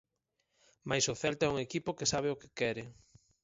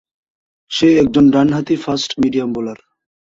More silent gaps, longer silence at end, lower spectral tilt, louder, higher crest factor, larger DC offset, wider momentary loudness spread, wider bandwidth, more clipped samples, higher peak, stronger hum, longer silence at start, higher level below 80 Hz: neither; about the same, 0.5 s vs 0.45 s; second, -3.5 dB/octave vs -6 dB/octave; second, -34 LUFS vs -15 LUFS; first, 20 dB vs 14 dB; neither; about the same, 10 LU vs 12 LU; about the same, 7.6 kHz vs 7.8 kHz; neither; second, -16 dBFS vs -2 dBFS; neither; first, 0.85 s vs 0.7 s; second, -64 dBFS vs -48 dBFS